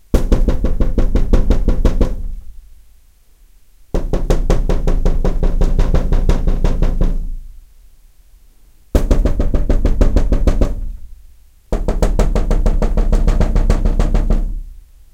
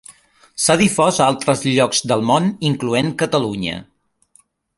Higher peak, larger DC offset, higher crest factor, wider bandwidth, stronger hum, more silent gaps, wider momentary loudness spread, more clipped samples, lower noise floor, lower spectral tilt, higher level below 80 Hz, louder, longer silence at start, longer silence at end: about the same, 0 dBFS vs -2 dBFS; neither; about the same, 14 dB vs 16 dB; second, 8.4 kHz vs 12 kHz; neither; neither; about the same, 9 LU vs 9 LU; neither; second, -46 dBFS vs -56 dBFS; first, -7.5 dB/octave vs -4 dB/octave; first, -14 dBFS vs -52 dBFS; about the same, -19 LUFS vs -17 LUFS; about the same, 0.15 s vs 0.1 s; second, 0.35 s vs 0.95 s